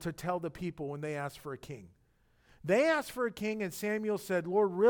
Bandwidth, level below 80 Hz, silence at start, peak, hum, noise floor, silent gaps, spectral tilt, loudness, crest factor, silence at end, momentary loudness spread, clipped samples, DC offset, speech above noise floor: 19 kHz; -64 dBFS; 0 s; -16 dBFS; none; -69 dBFS; none; -5.5 dB/octave; -33 LUFS; 18 dB; 0 s; 16 LU; under 0.1%; under 0.1%; 36 dB